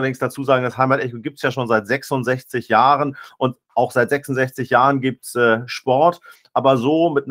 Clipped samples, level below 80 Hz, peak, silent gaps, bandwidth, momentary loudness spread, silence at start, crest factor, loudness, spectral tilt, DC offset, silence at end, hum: under 0.1%; -64 dBFS; 0 dBFS; none; 16 kHz; 8 LU; 0 s; 18 dB; -19 LUFS; -6 dB/octave; under 0.1%; 0 s; none